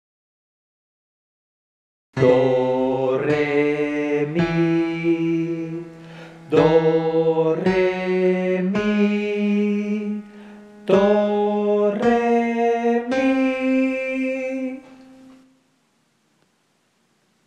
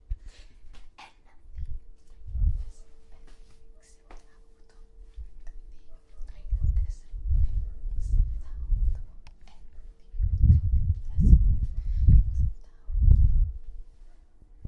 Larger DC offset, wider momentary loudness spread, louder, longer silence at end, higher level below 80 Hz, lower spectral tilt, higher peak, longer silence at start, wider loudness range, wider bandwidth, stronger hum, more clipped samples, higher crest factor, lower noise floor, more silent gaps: neither; second, 12 LU vs 25 LU; first, -20 LUFS vs -27 LUFS; first, 2.5 s vs 0 s; second, -56 dBFS vs -28 dBFS; second, -7.5 dB/octave vs -9.5 dB/octave; about the same, -4 dBFS vs -4 dBFS; first, 2.15 s vs 0.1 s; second, 4 LU vs 14 LU; first, 9 kHz vs 2.8 kHz; neither; neither; about the same, 18 dB vs 20 dB; first, -65 dBFS vs -50 dBFS; neither